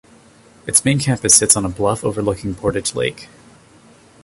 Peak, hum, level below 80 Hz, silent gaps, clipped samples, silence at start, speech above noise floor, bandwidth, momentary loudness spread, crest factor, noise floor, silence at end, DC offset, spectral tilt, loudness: 0 dBFS; none; -42 dBFS; none; under 0.1%; 0.65 s; 30 dB; 16 kHz; 12 LU; 20 dB; -48 dBFS; 1 s; under 0.1%; -3.5 dB/octave; -16 LUFS